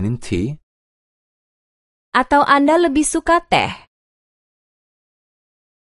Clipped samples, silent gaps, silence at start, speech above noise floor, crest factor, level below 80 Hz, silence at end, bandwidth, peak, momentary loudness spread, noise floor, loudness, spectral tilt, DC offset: under 0.1%; 0.63-2.12 s; 0 s; over 74 dB; 20 dB; -44 dBFS; 2.1 s; 11.5 kHz; 0 dBFS; 13 LU; under -90 dBFS; -16 LUFS; -4.5 dB/octave; under 0.1%